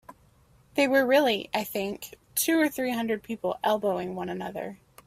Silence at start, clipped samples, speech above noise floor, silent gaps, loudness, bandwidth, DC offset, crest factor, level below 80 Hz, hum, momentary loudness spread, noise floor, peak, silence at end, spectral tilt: 0.1 s; under 0.1%; 33 dB; none; -27 LUFS; 16 kHz; under 0.1%; 18 dB; -64 dBFS; none; 12 LU; -60 dBFS; -10 dBFS; 0.3 s; -3.5 dB/octave